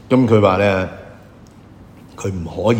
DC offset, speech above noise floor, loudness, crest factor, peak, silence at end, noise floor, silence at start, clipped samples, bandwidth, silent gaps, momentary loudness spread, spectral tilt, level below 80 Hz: under 0.1%; 27 dB; -17 LUFS; 18 dB; 0 dBFS; 0 s; -42 dBFS; 0.1 s; under 0.1%; 15.5 kHz; none; 15 LU; -7 dB/octave; -46 dBFS